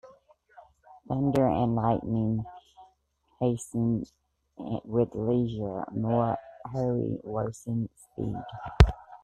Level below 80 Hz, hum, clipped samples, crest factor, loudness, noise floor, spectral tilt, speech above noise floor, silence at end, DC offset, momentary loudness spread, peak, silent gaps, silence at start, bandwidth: -38 dBFS; none; under 0.1%; 28 dB; -29 LUFS; -70 dBFS; -8 dB/octave; 43 dB; 0.05 s; under 0.1%; 12 LU; 0 dBFS; none; 0.05 s; 11.5 kHz